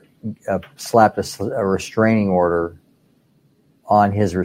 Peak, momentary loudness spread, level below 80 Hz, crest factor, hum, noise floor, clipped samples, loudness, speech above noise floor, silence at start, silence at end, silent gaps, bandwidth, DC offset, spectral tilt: 0 dBFS; 10 LU; -50 dBFS; 20 dB; none; -58 dBFS; under 0.1%; -18 LUFS; 41 dB; 0.25 s; 0 s; none; 16 kHz; under 0.1%; -6.5 dB/octave